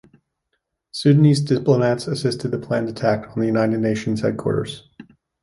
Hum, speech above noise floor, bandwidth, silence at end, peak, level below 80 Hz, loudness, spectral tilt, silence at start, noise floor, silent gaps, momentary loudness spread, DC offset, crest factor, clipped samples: none; 56 dB; 11.5 kHz; 0.4 s; -4 dBFS; -54 dBFS; -20 LUFS; -7 dB/octave; 0.95 s; -75 dBFS; none; 10 LU; under 0.1%; 18 dB; under 0.1%